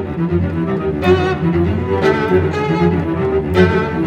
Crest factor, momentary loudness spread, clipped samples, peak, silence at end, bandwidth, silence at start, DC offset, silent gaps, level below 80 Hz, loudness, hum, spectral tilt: 14 dB; 4 LU; under 0.1%; 0 dBFS; 0 s; 8.6 kHz; 0 s; under 0.1%; none; -38 dBFS; -16 LUFS; none; -8 dB/octave